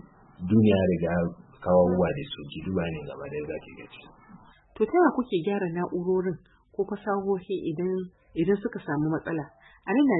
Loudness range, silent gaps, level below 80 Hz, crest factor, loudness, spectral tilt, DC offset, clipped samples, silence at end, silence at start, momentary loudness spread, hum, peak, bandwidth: 4 LU; none; -56 dBFS; 18 dB; -27 LUFS; -11.5 dB/octave; under 0.1%; under 0.1%; 0 s; 0.4 s; 15 LU; none; -10 dBFS; 4.1 kHz